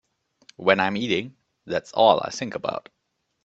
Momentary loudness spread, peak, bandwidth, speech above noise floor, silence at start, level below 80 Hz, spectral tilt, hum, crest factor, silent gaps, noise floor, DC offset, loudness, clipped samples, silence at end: 12 LU; 0 dBFS; 8 kHz; 34 dB; 0.6 s; -66 dBFS; -4.5 dB/octave; none; 24 dB; none; -57 dBFS; under 0.1%; -23 LUFS; under 0.1%; 0.65 s